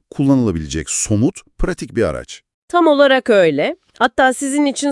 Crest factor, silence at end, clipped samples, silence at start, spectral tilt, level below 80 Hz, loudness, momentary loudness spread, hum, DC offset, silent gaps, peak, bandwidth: 16 dB; 0 s; under 0.1%; 0.15 s; -4.5 dB/octave; -34 dBFS; -16 LUFS; 12 LU; none; under 0.1%; 2.54-2.68 s; 0 dBFS; 12 kHz